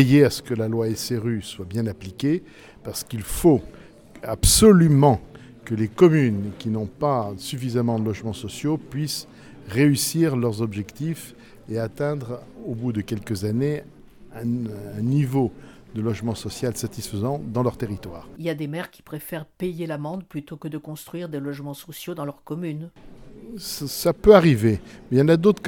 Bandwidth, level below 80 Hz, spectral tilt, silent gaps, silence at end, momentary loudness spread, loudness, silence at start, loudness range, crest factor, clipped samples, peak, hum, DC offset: 19 kHz; -42 dBFS; -5.5 dB/octave; none; 0 s; 18 LU; -23 LUFS; 0 s; 13 LU; 22 dB; under 0.1%; 0 dBFS; none; under 0.1%